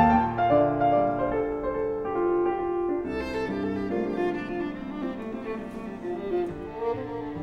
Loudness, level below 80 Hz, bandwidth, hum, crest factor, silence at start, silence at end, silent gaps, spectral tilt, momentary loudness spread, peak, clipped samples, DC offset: -28 LUFS; -48 dBFS; 7.2 kHz; none; 18 dB; 0 s; 0 s; none; -8.5 dB/octave; 12 LU; -8 dBFS; under 0.1%; under 0.1%